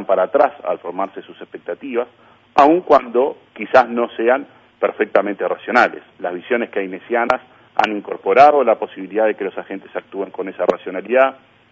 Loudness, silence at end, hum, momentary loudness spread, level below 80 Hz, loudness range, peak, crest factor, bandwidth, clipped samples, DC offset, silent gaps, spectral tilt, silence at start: -17 LUFS; 0.4 s; none; 15 LU; -62 dBFS; 3 LU; 0 dBFS; 18 dB; 7.6 kHz; under 0.1%; under 0.1%; none; -6 dB/octave; 0 s